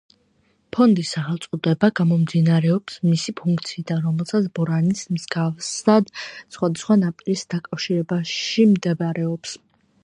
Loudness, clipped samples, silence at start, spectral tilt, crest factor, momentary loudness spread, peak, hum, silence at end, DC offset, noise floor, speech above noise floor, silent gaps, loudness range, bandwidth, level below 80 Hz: -21 LUFS; under 0.1%; 0.75 s; -6 dB/octave; 18 dB; 9 LU; -2 dBFS; none; 0.5 s; under 0.1%; -63 dBFS; 43 dB; none; 2 LU; 10.5 kHz; -64 dBFS